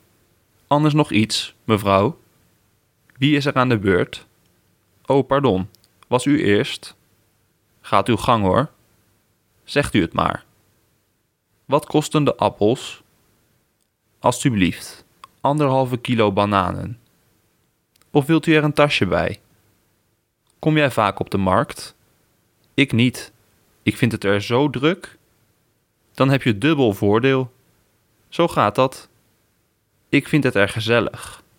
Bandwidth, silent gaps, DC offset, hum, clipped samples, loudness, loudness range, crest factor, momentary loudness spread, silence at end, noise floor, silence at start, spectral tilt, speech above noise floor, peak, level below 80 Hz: 17.5 kHz; none; under 0.1%; none; under 0.1%; -19 LUFS; 3 LU; 20 dB; 14 LU; 0.25 s; -68 dBFS; 0.7 s; -6 dB/octave; 50 dB; 0 dBFS; -52 dBFS